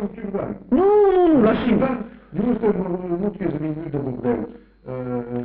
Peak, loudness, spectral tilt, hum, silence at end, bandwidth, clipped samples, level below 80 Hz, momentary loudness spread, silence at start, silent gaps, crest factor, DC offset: -8 dBFS; -21 LUFS; -7.5 dB/octave; none; 0 s; 4.5 kHz; under 0.1%; -46 dBFS; 13 LU; 0 s; none; 12 dB; under 0.1%